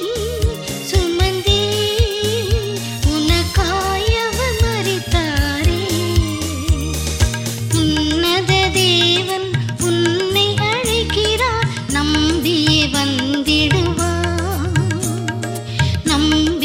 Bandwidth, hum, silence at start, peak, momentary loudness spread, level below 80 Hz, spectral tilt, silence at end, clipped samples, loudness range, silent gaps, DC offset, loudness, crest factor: 16.5 kHz; none; 0 s; -2 dBFS; 6 LU; -26 dBFS; -4.5 dB/octave; 0 s; under 0.1%; 3 LU; none; under 0.1%; -17 LUFS; 14 dB